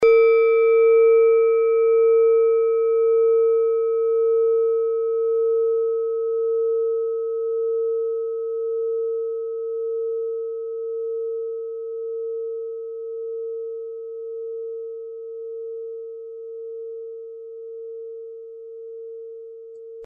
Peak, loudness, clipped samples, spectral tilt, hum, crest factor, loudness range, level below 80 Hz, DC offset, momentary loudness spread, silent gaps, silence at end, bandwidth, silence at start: -8 dBFS; -21 LUFS; under 0.1%; -5 dB/octave; none; 14 dB; 17 LU; -72 dBFS; under 0.1%; 20 LU; none; 0 s; 5.2 kHz; 0 s